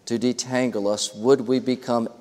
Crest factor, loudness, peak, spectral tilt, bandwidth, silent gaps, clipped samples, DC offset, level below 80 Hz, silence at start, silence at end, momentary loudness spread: 18 dB; -23 LUFS; -6 dBFS; -4.5 dB/octave; 14 kHz; none; under 0.1%; under 0.1%; -68 dBFS; 0.05 s; 0.05 s; 4 LU